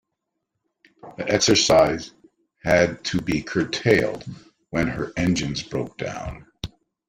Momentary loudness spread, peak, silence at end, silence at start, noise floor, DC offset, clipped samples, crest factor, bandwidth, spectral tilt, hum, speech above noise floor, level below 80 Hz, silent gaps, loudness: 20 LU; -2 dBFS; 0.4 s; 1.05 s; -80 dBFS; under 0.1%; under 0.1%; 20 dB; 16 kHz; -4 dB/octave; none; 58 dB; -46 dBFS; none; -22 LUFS